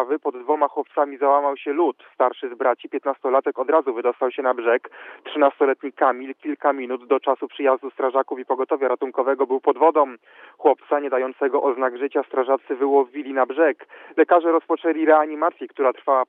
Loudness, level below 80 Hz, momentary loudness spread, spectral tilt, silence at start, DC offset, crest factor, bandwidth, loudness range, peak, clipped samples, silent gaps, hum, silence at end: -21 LUFS; under -90 dBFS; 7 LU; -7 dB/octave; 0 s; under 0.1%; 18 dB; 3.9 kHz; 2 LU; -2 dBFS; under 0.1%; none; none; 0.05 s